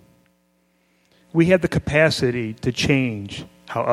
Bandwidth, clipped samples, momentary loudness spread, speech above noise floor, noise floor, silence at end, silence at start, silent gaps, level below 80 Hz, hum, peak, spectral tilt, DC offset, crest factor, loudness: 13.5 kHz; under 0.1%; 13 LU; 44 dB; -64 dBFS; 0 s; 1.35 s; none; -46 dBFS; none; -2 dBFS; -6 dB/octave; under 0.1%; 20 dB; -20 LUFS